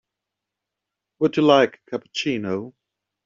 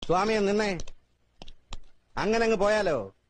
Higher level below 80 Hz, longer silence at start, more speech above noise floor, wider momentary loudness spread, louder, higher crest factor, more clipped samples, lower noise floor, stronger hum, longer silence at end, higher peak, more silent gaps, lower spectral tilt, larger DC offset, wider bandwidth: second, -68 dBFS vs -44 dBFS; first, 1.2 s vs 0 s; first, 64 dB vs 26 dB; about the same, 15 LU vs 14 LU; first, -21 LUFS vs -26 LUFS; about the same, 20 dB vs 16 dB; neither; first, -84 dBFS vs -52 dBFS; neither; first, 0.55 s vs 0.2 s; first, -4 dBFS vs -12 dBFS; neither; second, -3.5 dB/octave vs -5 dB/octave; neither; second, 7.6 kHz vs 9.6 kHz